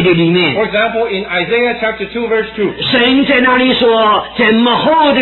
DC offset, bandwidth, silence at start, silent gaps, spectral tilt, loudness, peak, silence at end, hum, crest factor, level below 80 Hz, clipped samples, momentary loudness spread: under 0.1%; 4.3 kHz; 0 s; none; -8 dB/octave; -11 LUFS; 0 dBFS; 0 s; none; 12 dB; -44 dBFS; under 0.1%; 7 LU